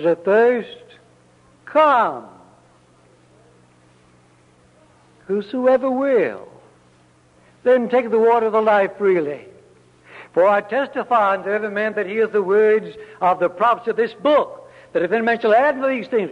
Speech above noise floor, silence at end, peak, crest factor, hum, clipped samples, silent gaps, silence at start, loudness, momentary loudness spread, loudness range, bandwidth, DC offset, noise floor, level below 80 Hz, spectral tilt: 36 dB; 0 s; -4 dBFS; 16 dB; none; under 0.1%; none; 0 s; -18 LUFS; 9 LU; 4 LU; 8.8 kHz; under 0.1%; -54 dBFS; -66 dBFS; -6.5 dB/octave